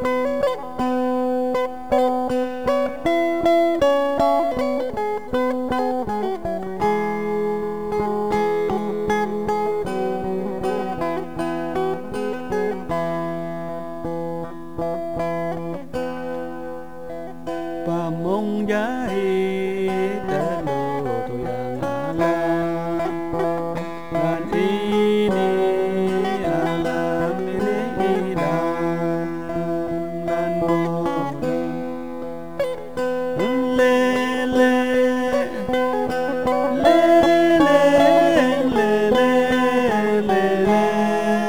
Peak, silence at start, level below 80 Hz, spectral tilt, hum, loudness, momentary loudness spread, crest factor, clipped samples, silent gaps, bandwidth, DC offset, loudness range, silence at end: -2 dBFS; 0 s; -48 dBFS; -6.5 dB/octave; none; -21 LUFS; 10 LU; 18 dB; under 0.1%; none; over 20 kHz; 2%; 10 LU; 0 s